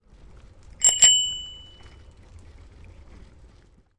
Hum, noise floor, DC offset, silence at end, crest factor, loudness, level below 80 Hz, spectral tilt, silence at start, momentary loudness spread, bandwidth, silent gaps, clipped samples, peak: none; -55 dBFS; under 0.1%; 2.4 s; 24 dB; -17 LUFS; -50 dBFS; 2 dB/octave; 0.8 s; 20 LU; 11.5 kHz; none; under 0.1%; -4 dBFS